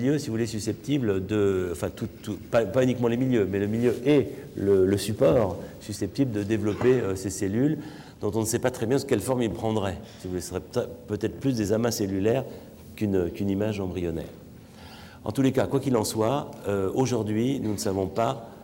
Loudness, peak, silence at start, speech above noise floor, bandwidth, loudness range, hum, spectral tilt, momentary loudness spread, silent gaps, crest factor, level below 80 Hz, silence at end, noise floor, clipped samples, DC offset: -26 LUFS; -12 dBFS; 0 s; 20 dB; 17 kHz; 4 LU; none; -6 dB/octave; 11 LU; none; 14 dB; -56 dBFS; 0 s; -46 dBFS; under 0.1%; under 0.1%